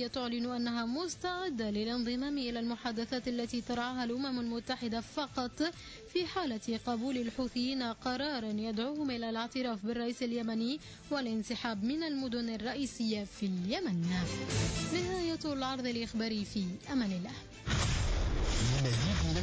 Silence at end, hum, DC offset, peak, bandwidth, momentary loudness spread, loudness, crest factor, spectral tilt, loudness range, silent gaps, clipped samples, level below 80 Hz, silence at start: 0 s; none; under 0.1%; -22 dBFS; 8 kHz; 4 LU; -35 LUFS; 14 dB; -5 dB/octave; 2 LU; none; under 0.1%; -46 dBFS; 0 s